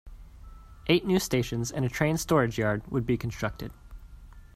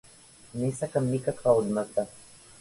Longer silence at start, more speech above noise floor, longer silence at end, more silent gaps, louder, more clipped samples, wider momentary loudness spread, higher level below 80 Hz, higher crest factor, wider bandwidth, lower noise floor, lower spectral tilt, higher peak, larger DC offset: second, 0.05 s vs 0.55 s; second, 21 dB vs 26 dB; second, 0.1 s vs 0.4 s; neither; about the same, -28 LUFS vs -28 LUFS; neither; about the same, 10 LU vs 10 LU; first, -46 dBFS vs -62 dBFS; about the same, 20 dB vs 20 dB; first, 15.5 kHz vs 11.5 kHz; second, -48 dBFS vs -53 dBFS; second, -5.5 dB/octave vs -7 dB/octave; about the same, -10 dBFS vs -10 dBFS; neither